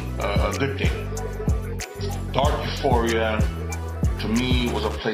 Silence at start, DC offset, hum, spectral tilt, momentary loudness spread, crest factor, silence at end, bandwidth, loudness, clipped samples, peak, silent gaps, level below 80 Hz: 0 s; under 0.1%; none; -5.5 dB/octave; 8 LU; 18 dB; 0 s; 16 kHz; -24 LUFS; under 0.1%; -4 dBFS; none; -30 dBFS